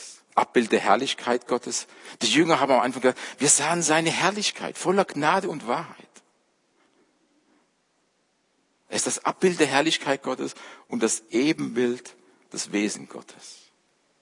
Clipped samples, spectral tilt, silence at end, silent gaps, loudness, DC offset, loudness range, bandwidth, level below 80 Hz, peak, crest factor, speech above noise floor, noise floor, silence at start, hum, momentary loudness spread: under 0.1%; -3 dB/octave; 0.7 s; none; -24 LUFS; under 0.1%; 9 LU; 11 kHz; -78 dBFS; -4 dBFS; 22 dB; 45 dB; -70 dBFS; 0 s; none; 15 LU